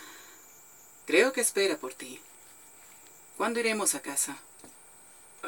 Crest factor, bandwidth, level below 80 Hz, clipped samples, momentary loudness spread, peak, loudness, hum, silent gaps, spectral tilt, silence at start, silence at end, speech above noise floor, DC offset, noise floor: 22 dB; 19 kHz; -82 dBFS; under 0.1%; 26 LU; -10 dBFS; -28 LUFS; none; none; -1 dB/octave; 0 s; 0 s; 25 dB; under 0.1%; -54 dBFS